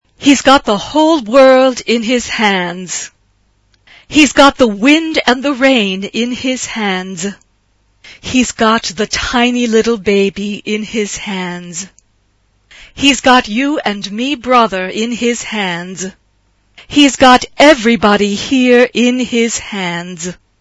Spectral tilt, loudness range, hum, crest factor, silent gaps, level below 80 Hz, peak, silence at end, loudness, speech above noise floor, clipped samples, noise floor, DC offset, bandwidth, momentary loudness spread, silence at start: -3.5 dB/octave; 6 LU; none; 12 dB; none; -42 dBFS; 0 dBFS; 0.25 s; -12 LUFS; 45 dB; 0.6%; -56 dBFS; under 0.1%; 11 kHz; 14 LU; 0.2 s